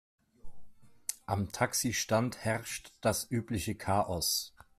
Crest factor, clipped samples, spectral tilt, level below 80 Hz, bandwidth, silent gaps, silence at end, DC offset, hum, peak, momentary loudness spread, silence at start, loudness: 22 dB; under 0.1%; -3.5 dB/octave; -60 dBFS; 15.5 kHz; none; 0.3 s; under 0.1%; none; -12 dBFS; 8 LU; 0.45 s; -33 LUFS